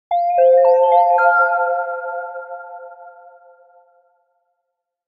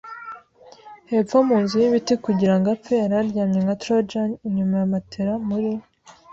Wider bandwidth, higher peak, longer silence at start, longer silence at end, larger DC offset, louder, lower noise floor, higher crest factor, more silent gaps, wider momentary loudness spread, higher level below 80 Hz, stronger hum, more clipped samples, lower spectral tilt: second, 5 kHz vs 7.8 kHz; about the same, -2 dBFS vs -4 dBFS; about the same, 0.1 s vs 0.05 s; first, 1.95 s vs 0.5 s; neither; first, -15 LUFS vs -21 LUFS; first, -77 dBFS vs -48 dBFS; about the same, 16 dB vs 16 dB; neither; first, 21 LU vs 8 LU; second, -72 dBFS vs -58 dBFS; neither; neither; second, -3 dB/octave vs -7.5 dB/octave